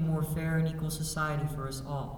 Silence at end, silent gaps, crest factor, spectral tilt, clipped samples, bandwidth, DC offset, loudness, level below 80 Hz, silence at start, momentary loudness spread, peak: 0 s; none; 14 dB; -6 dB/octave; under 0.1%; 17.5 kHz; under 0.1%; -32 LUFS; -46 dBFS; 0 s; 6 LU; -18 dBFS